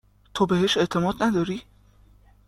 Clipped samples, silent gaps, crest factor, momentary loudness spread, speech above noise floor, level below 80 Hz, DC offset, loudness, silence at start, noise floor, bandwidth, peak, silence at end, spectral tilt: under 0.1%; none; 18 dB; 12 LU; 32 dB; -52 dBFS; under 0.1%; -23 LUFS; 0.35 s; -55 dBFS; 14 kHz; -8 dBFS; 0.85 s; -5.5 dB/octave